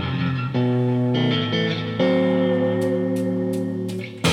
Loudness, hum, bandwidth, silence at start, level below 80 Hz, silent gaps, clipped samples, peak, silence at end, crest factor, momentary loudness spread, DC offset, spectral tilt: -22 LUFS; none; 14.5 kHz; 0 s; -60 dBFS; none; under 0.1%; -6 dBFS; 0 s; 14 dB; 5 LU; under 0.1%; -6.5 dB/octave